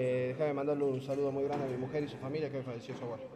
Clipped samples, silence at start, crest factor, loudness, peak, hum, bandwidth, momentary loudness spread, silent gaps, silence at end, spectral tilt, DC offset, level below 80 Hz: under 0.1%; 0 s; 12 dB; -36 LUFS; -22 dBFS; none; 11 kHz; 9 LU; none; 0 s; -8 dB/octave; under 0.1%; -70 dBFS